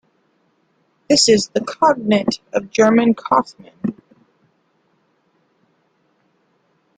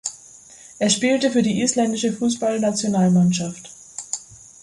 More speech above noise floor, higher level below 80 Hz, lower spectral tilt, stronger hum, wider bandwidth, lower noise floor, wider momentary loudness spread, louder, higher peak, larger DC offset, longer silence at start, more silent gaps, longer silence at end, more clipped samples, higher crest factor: first, 47 dB vs 26 dB; about the same, -60 dBFS vs -60 dBFS; about the same, -3.5 dB/octave vs -4.5 dB/octave; neither; second, 9.6 kHz vs 11.5 kHz; first, -63 dBFS vs -45 dBFS; about the same, 14 LU vs 14 LU; first, -16 LUFS vs -20 LUFS; first, -2 dBFS vs -6 dBFS; neither; first, 1.1 s vs 0.05 s; neither; first, 3.05 s vs 0.3 s; neither; about the same, 18 dB vs 16 dB